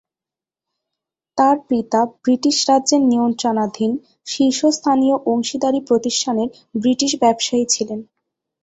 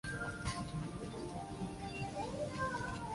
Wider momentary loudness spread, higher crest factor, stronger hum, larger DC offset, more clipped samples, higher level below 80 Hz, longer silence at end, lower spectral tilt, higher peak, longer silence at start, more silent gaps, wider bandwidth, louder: about the same, 7 LU vs 5 LU; about the same, 16 dB vs 16 dB; neither; neither; neither; second, -62 dBFS vs -54 dBFS; first, 0.6 s vs 0 s; second, -3.5 dB/octave vs -5 dB/octave; first, -2 dBFS vs -26 dBFS; first, 1.35 s vs 0.05 s; neither; second, 8.2 kHz vs 11.5 kHz; first, -17 LUFS vs -42 LUFS